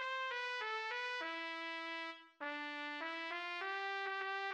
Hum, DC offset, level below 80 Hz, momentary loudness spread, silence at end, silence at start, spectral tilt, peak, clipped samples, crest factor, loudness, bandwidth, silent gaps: none; under 0.1%; under -90 dBFS; 4 LU; 0 s; 0 s; 0 dB/octave; -28 dBFS; under 0.1%; 16 dB; -42 LUFS; 10.5 kHz; none